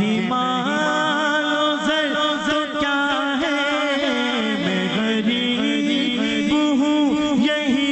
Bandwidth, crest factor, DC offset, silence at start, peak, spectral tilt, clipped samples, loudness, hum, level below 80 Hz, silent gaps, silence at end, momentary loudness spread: 8.4 kHz; 10 dB; under 0.1%; 0 s; -10 dBFS; -4 dB/octave; under 0.1%; -19 LUFS; none; -54 dBFS; none; 0 s; 2 LU